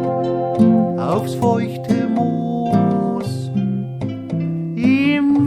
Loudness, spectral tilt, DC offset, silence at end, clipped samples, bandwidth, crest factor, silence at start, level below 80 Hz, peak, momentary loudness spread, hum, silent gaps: -18 LUFS; -8 dB/octave; under 0.1%; 0 s; under 0.1%; 13.5 kHz; 16 dB; 0 s; -54 dBFS; -2 dBFS; 9 LU; none; none